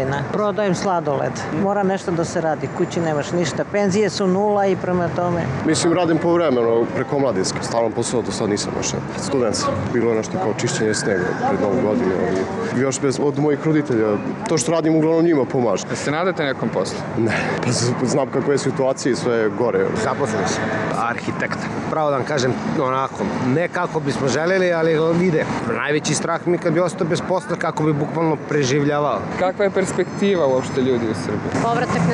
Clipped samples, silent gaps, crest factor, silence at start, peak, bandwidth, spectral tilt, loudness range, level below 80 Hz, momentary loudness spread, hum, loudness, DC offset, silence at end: under 0.1%; none; 14 dB; 0 s; -6 dBFS; 11.5 kHz; -5.5 dB/octave; 2 LU; -52 dBFS; 5 LU; none; -20 LUFS; under 0.1%; 0 s